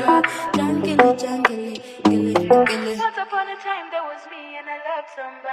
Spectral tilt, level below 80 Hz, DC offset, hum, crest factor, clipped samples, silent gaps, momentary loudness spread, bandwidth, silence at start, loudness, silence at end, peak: -5 dB/octave; -62 dBFS; under 0.1%; none; 20 dB; under 0.1%; none; 16 LU; 14 kHz; 0 s; -20 LUFS; 0 s; 0 dBFS